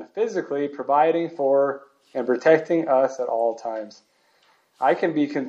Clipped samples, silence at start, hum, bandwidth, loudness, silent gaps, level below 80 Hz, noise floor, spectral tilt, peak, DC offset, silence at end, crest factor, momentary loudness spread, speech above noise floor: under 0.1%; 0 s; none; 7.8 kHz; -22 LUFS; none; -82 dBFS; -62 dBFS; -6.5 dB/octave; -2 dBFS; under 0.1%; 0 s; 20 dB; 13 LU; 40 dB